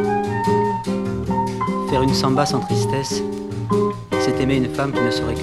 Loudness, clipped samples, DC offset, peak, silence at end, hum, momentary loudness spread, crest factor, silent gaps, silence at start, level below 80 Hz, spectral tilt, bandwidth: -20 LUFS; under 0.1%; under 0.1%; -2 dBFS; 0 s; none; 6 LU; 18 dB; none; 0 s; -40 dBFS; -6 dB/octave; 13 kHz